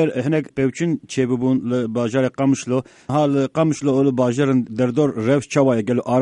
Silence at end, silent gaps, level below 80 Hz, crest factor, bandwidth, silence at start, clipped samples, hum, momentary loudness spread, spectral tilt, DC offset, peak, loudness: 0 s; none; -58 dBFS; 14 dB; 10.5 kHz; 0 s; under 0.1%; none; 5 LU; -7 dB/octave; under 0.1%; -4 dBFS; -19 LUFS